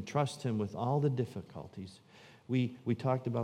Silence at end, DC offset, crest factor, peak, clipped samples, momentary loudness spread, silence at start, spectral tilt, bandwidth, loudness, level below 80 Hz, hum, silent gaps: 0 s; under 0.1%; 18 dB; -16 dBFS; under 0.1%; 16 LU; 0 s; -7.5 dB/octave; 11 kHz; -34 LUFS; -74 dBFS; none; none